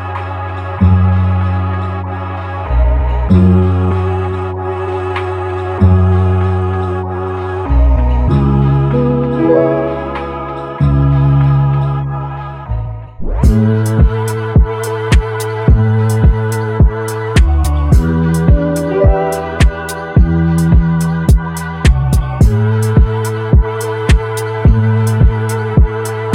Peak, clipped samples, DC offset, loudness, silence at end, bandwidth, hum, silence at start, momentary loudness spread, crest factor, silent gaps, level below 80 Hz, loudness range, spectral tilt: 0 dBFS; under 0.1%; under 0.1%; -13 LUFS; 0 s; 16 kHz; none; 0 s; 10 LU; 12 dB; none; -16 dBFS; 2 LU; -7.5 dB/octave